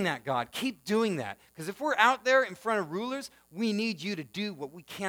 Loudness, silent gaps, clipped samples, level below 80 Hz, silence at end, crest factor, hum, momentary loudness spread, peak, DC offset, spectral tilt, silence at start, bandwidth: -30 LUFS; none; under 0.1%; -74 dBFS; 0 s; 24 dB; none; 16 LU; -8 dBFS; under 0.1%; -4.5 dB/octave; 0 s; over 20 kHz